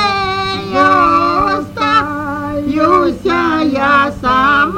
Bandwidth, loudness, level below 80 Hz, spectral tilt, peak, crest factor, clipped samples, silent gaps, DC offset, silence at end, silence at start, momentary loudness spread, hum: 16.5 kHz; -13 LUFS; -38 dBFS; -5.5 dB/octave; 0 dBFS; 12 dB; under 0.1%; none; under 0.1%; 0 s; 0 s; 8 LU; none